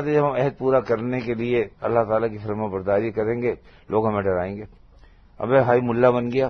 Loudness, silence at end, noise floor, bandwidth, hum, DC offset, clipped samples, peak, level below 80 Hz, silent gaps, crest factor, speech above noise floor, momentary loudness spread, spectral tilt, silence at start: -22 LUFS; 0 s; -50 dBFS; 6.4 kHz; none; under 0.1%; under 0.1%; -4 dBFS; -52 dBFS; none; 18 dB; 28 dB; 9 LU; -9 dB/octave; 0 s